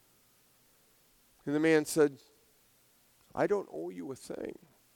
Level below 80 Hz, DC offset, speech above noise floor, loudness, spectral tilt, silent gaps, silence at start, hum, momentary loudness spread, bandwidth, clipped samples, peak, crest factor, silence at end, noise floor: -74 dBFS; under 0.1%; 36 dB; -32 LUFS; -5 dB/octave; none; 1.45 s; none; 17 LU; 19 kHz; under 0.1%; -14 dBFS; 20 dB; 0.4 s; -67 dBFS